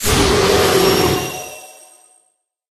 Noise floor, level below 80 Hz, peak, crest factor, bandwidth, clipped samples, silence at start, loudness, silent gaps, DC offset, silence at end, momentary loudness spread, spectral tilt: -64 dBFS; -32 dBFS; -2 dBFS; 16 dB; 13.5 kHz; under 0.1%; 0 s; -14 LUFS; none; under 0.1%; 1.05 s; 17 LU; -3.5 dB/octave